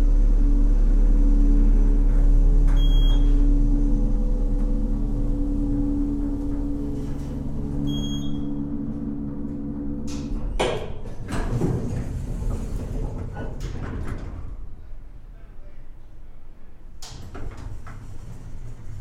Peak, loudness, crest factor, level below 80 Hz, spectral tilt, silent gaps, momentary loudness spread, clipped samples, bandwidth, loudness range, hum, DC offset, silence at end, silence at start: -8 dBFS; -26 LUFS; 12 dB; -22 dBFS; -7 dB/octave; none; 19 LU; under 0.1%; 7.6 kHz; 19 LU; none; under 0.1%; 0 s; 0 s